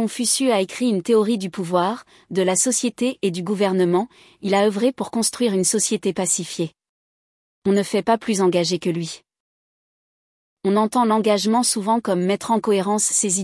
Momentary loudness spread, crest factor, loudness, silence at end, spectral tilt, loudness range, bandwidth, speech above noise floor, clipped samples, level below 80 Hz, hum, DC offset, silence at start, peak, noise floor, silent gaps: 9 LU; 16 dB; -20 LUFS; 0 s; -4 dB/octave; 3 LU; 12 kHz; over 70 dB; under 0.1%; -68 dBFS; none; under 0.1%; 0 s; -6 dBFS; under -90 dBFS; 6.89-7.62 s, 9.40-10.57 s